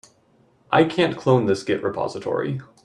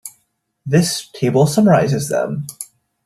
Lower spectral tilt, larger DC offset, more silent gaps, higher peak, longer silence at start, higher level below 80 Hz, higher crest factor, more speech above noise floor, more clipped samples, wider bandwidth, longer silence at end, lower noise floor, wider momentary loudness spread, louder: about the same, -6.5 dB/octave vs -5.5 dB/octave; neither; neither; about the same, -2 dBFS vs -2 dBFS; first, 0.7 s vs 0.05 s; second, -60 dBFS vs -54 dBFS; about the same, 20 dB vs 16 dB; second, 38 dB vs 51 dB; neither; second, 11 kHz vs 14 kHz; second, 0.2 s vs 0.4 s; second, -59 dBFS vs -66 dBFS; second, 7 LU vs 20 LU; second, -22 LUFS vs -16 LUFS